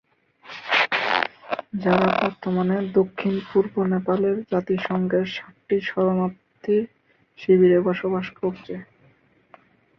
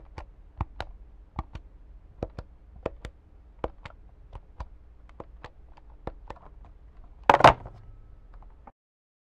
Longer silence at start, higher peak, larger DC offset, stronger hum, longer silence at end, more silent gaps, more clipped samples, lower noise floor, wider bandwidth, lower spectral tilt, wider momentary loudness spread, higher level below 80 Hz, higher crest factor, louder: first, 0.45 s vs 0.15 s; about the same, -2 dBFS vs -2 dBFS; neither; neither; second, 1.15 s vs 1.7 s; neither; neither; first, -59 dBFS vs -52 dBFS; second, 6.6 kHz vs 12 kHz; first, -7.5 dB/octave vs -5.5 dB/octave; second, 13 LU vs 30 LU; second, -62 dBFS vs -46 dBFS; second, 22 dB vs 30 dB; first, -22 LUFS vs -26 LUFS